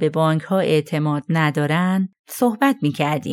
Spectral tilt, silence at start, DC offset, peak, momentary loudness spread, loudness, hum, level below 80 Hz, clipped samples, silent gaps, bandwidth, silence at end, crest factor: -6.5 dB/octave; 0 s; under 0.1%; -6 dBFS; 4 LU; -20 LUFS; none; -70 dBFS; under 0.1%; 2.19-2.24 s; 17 kHz; 0 s; 14 dB